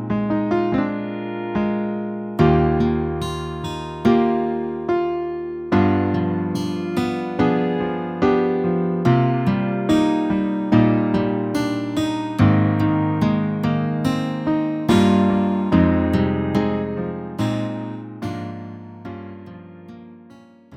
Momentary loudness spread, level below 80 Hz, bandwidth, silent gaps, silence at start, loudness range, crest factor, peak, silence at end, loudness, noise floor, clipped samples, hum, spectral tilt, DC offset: 12 LU; -42 dBFS; 14.5 kHz; none; 0 s; 5 LU; 16 dB; -2 dBFS; 0 s; -20 LUFS; -46 dBFS; under 0.1%; none; -8 dB/octave; under 0.1%